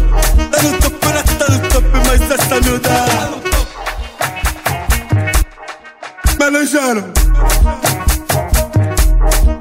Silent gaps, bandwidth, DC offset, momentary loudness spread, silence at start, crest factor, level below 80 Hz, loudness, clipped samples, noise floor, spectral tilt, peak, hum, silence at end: none; 16.5 kHz; under 0.1%; 7 LU; 0 s; 12 dB; -14 dBFS; -14 LUFS; under 0.1%; -32 dBFS; -4 dB/octave; 0 dBFS; none; 0 s